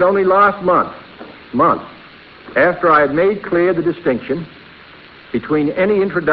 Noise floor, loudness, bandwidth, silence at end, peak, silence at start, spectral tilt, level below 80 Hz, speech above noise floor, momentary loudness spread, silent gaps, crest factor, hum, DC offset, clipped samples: -40 dBFS; -15 LUFS; 5.4 kHz; 0 s; 0 dBFS; 0 s; -10 dB/octave; -50 dBFS; 26 dB; 13 LU; none; 16 dB; none; under 0.1%; under 0.1%